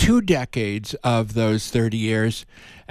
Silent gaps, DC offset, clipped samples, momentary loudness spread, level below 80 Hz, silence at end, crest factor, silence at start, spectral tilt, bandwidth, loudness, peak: none; under 0.1%; under 0.1%; 6 LU; -36 dBFS; 0.1 s; 16 dB; 0 s; -5.5 dB/octave; 14 kHz; -22 LUFS; -6 dBFS